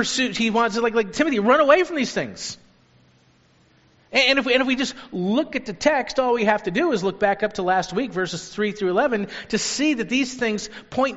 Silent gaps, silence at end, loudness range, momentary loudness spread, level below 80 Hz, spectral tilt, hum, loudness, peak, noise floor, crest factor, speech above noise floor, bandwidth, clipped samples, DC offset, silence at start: none; 0 s; 2 LU; 10 LU; -54 dBFS; -2.5 dB/octave; none; -21 LUFS; -2 dBFS; -58 dBFS; 20 dB; 36 dB; 8 kHz; under 0.1%; under 0.1%; 0 s